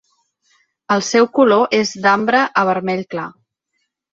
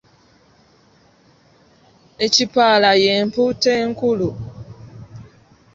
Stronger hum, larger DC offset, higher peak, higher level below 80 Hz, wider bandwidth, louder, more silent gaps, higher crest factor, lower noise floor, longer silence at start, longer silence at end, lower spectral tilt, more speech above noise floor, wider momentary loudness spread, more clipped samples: neither; neither; about the same, -2 dBFS vs -2 dBFS; second, -64 dBFS vs -52 dBFS; about the same, 8 kHz vs 7.8 kHz; about the same, -15 LUFS vs -16 LUFS; neither; about the same, 16 dB vs 20 dB; first, -72 dBFS vs -54 dBFS; second, 0.9 s vs 2.2 s; first, 0.85 s vs 0.55 s; about the same, -4 dB/octave vs -3.5 dB/octave; first, 57 dB vs 38 dB; second, 12 LU vs 26 LU; neither